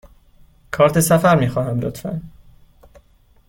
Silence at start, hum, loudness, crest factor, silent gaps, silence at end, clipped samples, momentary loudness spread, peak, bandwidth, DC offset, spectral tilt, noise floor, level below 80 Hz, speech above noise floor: 0.7 s; none; -17 LUFS; 18 dB; none; 1.2 s; under 0.1%; 16 LU; -2 dBFS; 17 kHz; under 0.1%; -6 dB/octave; -53 dBFS; -46 dBFS; 37 dB